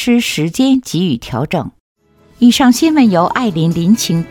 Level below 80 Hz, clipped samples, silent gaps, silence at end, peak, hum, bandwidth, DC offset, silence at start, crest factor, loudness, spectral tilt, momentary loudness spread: -44 dBFS; under 0.1%; 1.80-1.96 s; 0 s; 0 dBFS; none; 17.5 kHz; under 0.1%; 0 s; 12 dB; -13 LUFS; -5 dB/octave; 9 LU